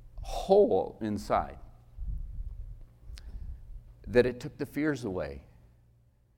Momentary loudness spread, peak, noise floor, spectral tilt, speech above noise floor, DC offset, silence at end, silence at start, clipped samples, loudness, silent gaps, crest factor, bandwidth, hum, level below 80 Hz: 24 LU; -8 dBFS; -64 dBFS; -6.5 dB/octave; 36 dB; under 0.1%; 0.95 s; 0 s; under 0.1%; -30 LUFS; none; 24 dB; 16 kHz; none; -44 dBFS